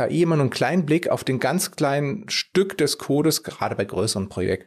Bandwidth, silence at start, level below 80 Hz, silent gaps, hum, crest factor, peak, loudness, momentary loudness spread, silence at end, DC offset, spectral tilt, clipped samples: 15.5 kHz; 0 s; -60 dBFS; none; none; 14 dB; -8 dBFS; -22 LUFS; 5 LU; 0.05 s; under 0.1%; -5 dB/octave; under 0.1%